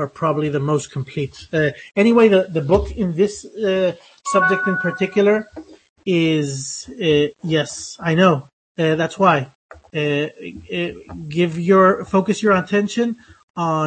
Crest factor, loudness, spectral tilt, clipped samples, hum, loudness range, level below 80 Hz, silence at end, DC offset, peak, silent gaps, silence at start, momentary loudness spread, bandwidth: 18 dB; -19 LUFS; -5.5 dB/octave; under 0.1%; none; 2 LU; -44 dBFS; 0 s; under 0.1%; -2 dBFS; 5.89-5.96 s, 8.53-8.75 s, 9.55-9.69 s, 13.43-13.54 s; 0 s; 13 LU; 8.8 kHz